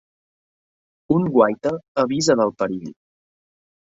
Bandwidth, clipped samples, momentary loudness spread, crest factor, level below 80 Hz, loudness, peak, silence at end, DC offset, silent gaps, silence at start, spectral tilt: 8 kHz; under 0.1%; 8 LU; 20 dB; -60 dBFS; -20 LUFS; -2 dBFS; 0.95 s; under 0.1%; 1.88-1.95 s; 1.1 s; -5.5 dB/octave